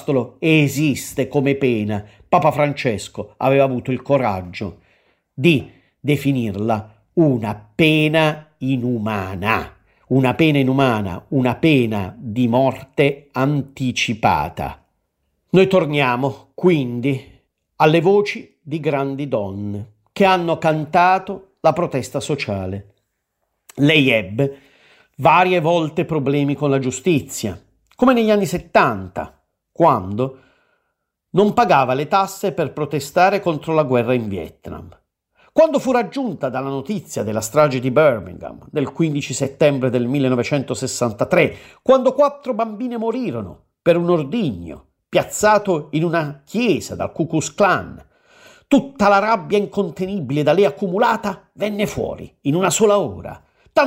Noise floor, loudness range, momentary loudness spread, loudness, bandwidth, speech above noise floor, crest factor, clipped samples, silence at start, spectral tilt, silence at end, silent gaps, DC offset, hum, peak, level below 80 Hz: -74 dBFS; 3 LU; 11 LU; -18 LUFS; 16 kHz; 56 dB; 18 dB; under 0.1%; 0 s; -5.5 dB/octave; 0 s; none; under 0.1%; none; 0 dBFS; -52 dBFS